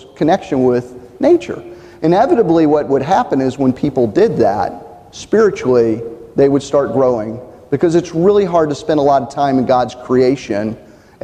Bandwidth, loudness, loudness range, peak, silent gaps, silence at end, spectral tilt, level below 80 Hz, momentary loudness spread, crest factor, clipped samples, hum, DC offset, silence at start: 9.4 kHz; -14 LUFS; 1 LU; -2 dBFS; none; 0.45 s; -7 dB/octave; -46 dBFS; 11 LU; 12 dB; under 0.1%; none; under 0.1%; 0.2 s